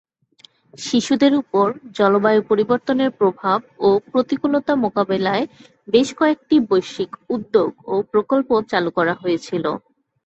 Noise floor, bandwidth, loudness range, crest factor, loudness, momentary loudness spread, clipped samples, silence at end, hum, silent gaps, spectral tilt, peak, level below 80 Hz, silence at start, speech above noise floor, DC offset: -52 dBFS; 8.2 kHz; 2 LU; 16 dB; -19 LUFS; 7 LU; under 0.1%; 0.45 s; none; none; -5.5 dB/octave; -2 dBFS; -60 dBFS; 0.8 s; 34 dB; under 0.1%